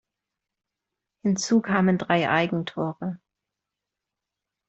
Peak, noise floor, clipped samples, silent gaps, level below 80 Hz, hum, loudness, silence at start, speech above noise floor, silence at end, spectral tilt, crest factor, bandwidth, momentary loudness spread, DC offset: -6 dBFS; -86 dBFS; under 0.1%; none; -66 dBFS; none; -24 LUFS; 1.25 s; 63 dB; 1.55 s; -5.5 dB/octave; 22 dB; 8.2 kHz; 12 LU; under 0.1%